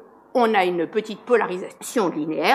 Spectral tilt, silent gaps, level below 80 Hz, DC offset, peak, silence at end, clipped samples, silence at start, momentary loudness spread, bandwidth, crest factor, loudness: -4.5 dB/octave; none; -76 dBFS; under 0.1%; -2 dBFS; 0 s; under 0.1%; 0 s; 8 LU; 15 kHz; 20 dB; -22 LUFS